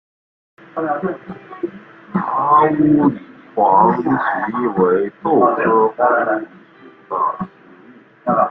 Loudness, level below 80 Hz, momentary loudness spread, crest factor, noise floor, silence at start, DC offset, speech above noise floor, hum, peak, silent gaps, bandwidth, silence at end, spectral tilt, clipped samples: -16 LUFS; -56 dBFS; 16 LU; 16 dB; -45 dBFS; 0.75 s; under 0.1%; 29 dB; none; -2 dBFS; none; 4.2 kHz; 0 s; -10.5 dB/octave; under 0.1%